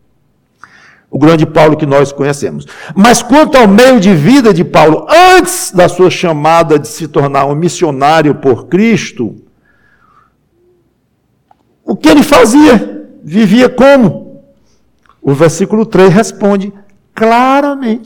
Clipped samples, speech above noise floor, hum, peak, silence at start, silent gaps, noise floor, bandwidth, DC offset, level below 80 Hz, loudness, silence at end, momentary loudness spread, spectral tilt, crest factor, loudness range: 0.4%; 50 dB; none; 0 dBFS; 1.15 s; none; -56 dBFS; 18.5 kHz; under 0.1%; -38 dBFS; -7 LUFS; 0 s; 13 LU; -5.5 dB/octave; 8 dB; 7 LU